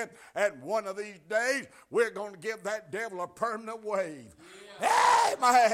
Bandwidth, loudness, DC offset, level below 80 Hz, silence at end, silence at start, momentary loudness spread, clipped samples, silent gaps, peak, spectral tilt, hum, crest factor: 16 kHz; -29 LUFS; under 0.1%; -74 dBFS; 0 s; 0 s; 15 LU; under 0.1%; none; -12 dBFS; -2 dB/octave; none; 18 dB